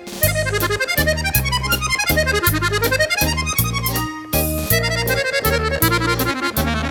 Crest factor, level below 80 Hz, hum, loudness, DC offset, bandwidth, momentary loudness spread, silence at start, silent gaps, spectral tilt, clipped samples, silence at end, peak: 18 dB; -30 dBFS; none; -18 LUFS; under 0.1%; over 20 kHz; 3 LU; 0 s; none; -3.5 dB/octave; under 0.1%; 0 s; -2 dBFS